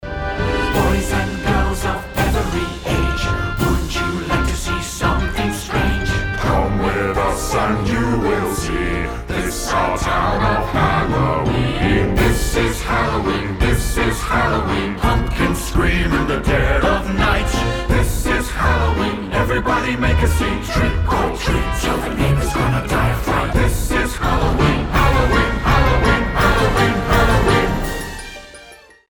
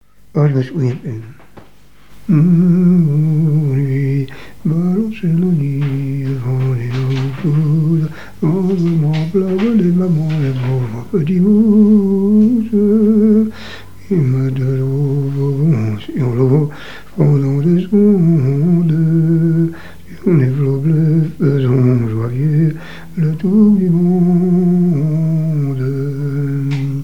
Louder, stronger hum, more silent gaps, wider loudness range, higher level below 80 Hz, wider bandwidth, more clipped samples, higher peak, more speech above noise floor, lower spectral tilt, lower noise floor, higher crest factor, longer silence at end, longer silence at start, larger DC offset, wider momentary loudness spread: second, -18 LUFS vs -14 LUFS; second, none vs 50 Hz at -35 dBFS; neither; about the same, 4 LU vs 4 LU; first, -22 dBFS vs -46 dBFS; first, over 20 kHz vs 6.8 kHz; neither; about the same, -2 dBFS vs 0 dBFS; second, 26 dB vs 34 dB; second, -5.5 dB/octave vs -10 dB/octave; about the same, -43 dBFS vs -46 dBFS; about the same, 16 dB vs 14 dB; first, 0.3 s vs 0 s; about the same, 0 s vs 0 s; second, under 0.1% vs 2%; second, 5 LU vs 9 LU